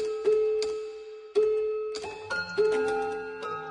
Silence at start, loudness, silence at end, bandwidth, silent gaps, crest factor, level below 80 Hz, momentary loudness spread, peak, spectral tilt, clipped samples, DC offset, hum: 0 s; -29 LUFS; 0 s; 10.5 kHz; none; 14 dB; -66 dBFS; 11 LU; -14 dBFS; -3.5 dB/octave; under 0.1%; under 0.1%; none